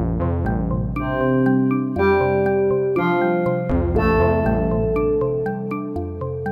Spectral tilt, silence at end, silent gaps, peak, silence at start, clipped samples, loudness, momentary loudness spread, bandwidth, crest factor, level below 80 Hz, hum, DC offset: -10 dB/octave; 0 s; none; -6 dBFS; 0 s; under 0.1%; -20 LUFS; 8 LU; 15 kHz; 12 dB; -32 dBFS; none; under 0.1%